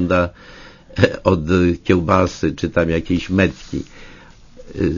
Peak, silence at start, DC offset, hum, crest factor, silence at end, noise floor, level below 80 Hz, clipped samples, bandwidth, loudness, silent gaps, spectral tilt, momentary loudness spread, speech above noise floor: 0 dBFS; 0 s; under 0.1%; none; 18 dB; 0 s; -42 dBFS; -38 dBFS; under 0.1%; 7.4 kHz; -18 LUFS; none; -7 dB/octave; 13 LU; 24 dB